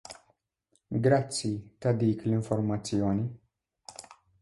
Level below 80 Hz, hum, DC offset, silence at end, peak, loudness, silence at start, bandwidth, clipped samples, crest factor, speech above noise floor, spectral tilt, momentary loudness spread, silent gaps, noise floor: -58 dBFS; none; under 0.1%; 0.3 s; -12 dBFS; -29 LUFS; 0.1 s; 11.5 kHz; under 0.1%; 18 dB; 46 dB; -6.5 dB/octave; 21 LU; none; -74 dBFS